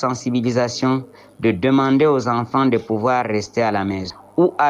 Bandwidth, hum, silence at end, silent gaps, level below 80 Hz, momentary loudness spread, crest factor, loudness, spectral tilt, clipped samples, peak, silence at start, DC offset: 10.5 kHz; none; 0 s; none; -50 dBFS; 7 LU; 14 dB; -19 LUFS; -6 dB/octave; under 0.1%; -4 dBFS; 0 s; under 0.1%